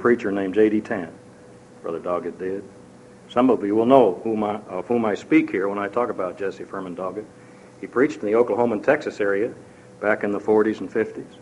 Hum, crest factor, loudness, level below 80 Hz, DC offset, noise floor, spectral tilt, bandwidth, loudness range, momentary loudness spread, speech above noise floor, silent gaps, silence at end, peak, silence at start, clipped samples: none; 22 dB; -22 LUFS; -64 dBFS; under 0.1%; -46 dBFS; -7 dB/octave; 11 kHz; 4 LU; 11 LU; 24 dB; none; 0.05 s; -2 dBFS; 0 s; under 0.1%